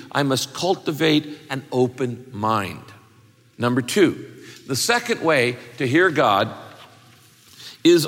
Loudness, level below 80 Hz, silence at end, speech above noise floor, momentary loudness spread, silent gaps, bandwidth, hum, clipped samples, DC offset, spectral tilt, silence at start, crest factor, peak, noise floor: -21 LUFS; -64 dBFS; 0 s; 32 dB; 16 LU; none; 17 kHz; none; under 0.1%; under 0.1%; -4.5 dB/octave; 0 s; 16 dB; -4 dBFS; -53 dBFS